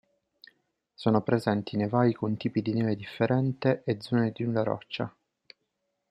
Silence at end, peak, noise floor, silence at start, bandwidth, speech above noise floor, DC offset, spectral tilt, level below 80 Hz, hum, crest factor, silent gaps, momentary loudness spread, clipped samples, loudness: 1 s; -8 dBFS; -80 dBFS; 1 s; 11 kHz; 53 dB; under 0.1%; -8.5 dB/octave; -68 dBFS; none; 20 dB; none; 6 LU; under 0.1%; -28 LUFS